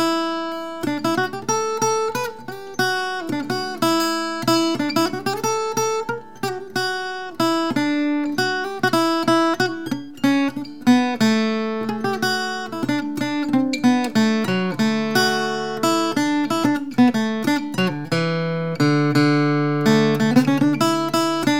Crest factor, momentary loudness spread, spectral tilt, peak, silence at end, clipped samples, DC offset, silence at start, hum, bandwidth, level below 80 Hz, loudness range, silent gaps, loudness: 18 dB; 8 LU; -4.5 dB/octave; -2 dBFS; 0 s; under 0.1%; 0.7%; 0 s; none; 17.5 kHz; -66 dBFS; 4 LU; none; -20 LUFS